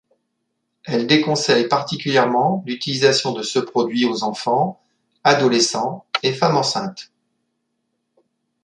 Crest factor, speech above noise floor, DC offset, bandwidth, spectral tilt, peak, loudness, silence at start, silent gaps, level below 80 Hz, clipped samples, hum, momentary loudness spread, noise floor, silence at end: 18 dB; 56 dB; under 0.1%; 11 kHz; -4 dB/octave; -2 dBFS; -18 LUFS; 0.85 s; none; -66 dBFS; under 0.1%; none; 8 LU; -74 dBFS; 1.6 s